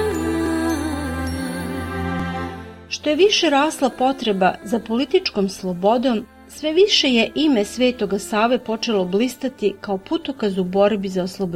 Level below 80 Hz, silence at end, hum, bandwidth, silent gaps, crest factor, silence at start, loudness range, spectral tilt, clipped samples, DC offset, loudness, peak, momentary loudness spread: -42 dBFS; 0 s; none; 16.5 kHz; none; 16 dB; 0 s; 3 LU; -4.5 dB/octave; under 0.1%; under 0.1%; -20 LUFS; -4 dBFS; 11 LU